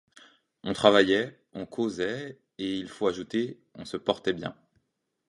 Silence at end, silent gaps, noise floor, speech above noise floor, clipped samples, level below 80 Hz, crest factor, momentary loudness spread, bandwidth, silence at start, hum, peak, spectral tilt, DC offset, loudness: 0.75 s; none; -79 dBFS; 51 dB; under 0.1%; -64 dBFS; 26 dB; 18 LU; 11.5 kHz; 0.65 s; none; -4 dBFS; -5 dB/octave; under 0.1%; -28 LUFS